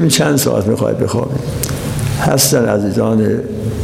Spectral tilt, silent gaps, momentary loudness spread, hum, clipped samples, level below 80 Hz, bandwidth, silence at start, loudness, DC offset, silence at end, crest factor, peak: -5 dB/octave; none; 8 LU; none; under 0.1%; -34 dBFS; 17 kHz; 0 s; -14 LUFS; under 0.1%; 0 s; 14 dB; 0 dBFS